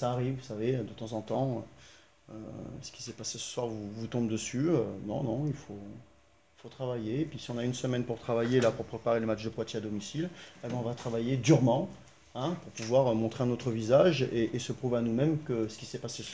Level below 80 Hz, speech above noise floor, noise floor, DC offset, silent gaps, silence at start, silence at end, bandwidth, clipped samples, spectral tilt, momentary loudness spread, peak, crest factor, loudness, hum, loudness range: -62 dBFS; 33 dB; -64 dBFS; under 0.1%; none; 0 s; 0 s; 8 kHz; under 0.1%; -6 dB/octave; 15 LU; -12 dBFS; 20 dB; -32 LUFS; none; 8 LU